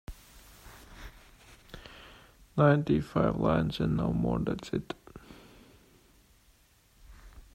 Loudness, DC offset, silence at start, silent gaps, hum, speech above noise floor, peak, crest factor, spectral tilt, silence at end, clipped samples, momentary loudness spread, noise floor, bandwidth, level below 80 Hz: -29 LUFS; under 0.1%; 0.1 s; none; none; 36 dB; -12 dBFS; 22 dB; -8 dB/octave; 0.15 s; under 0.1%; 26 LU; -64 dBFS; 16 kHz; -50 dBFS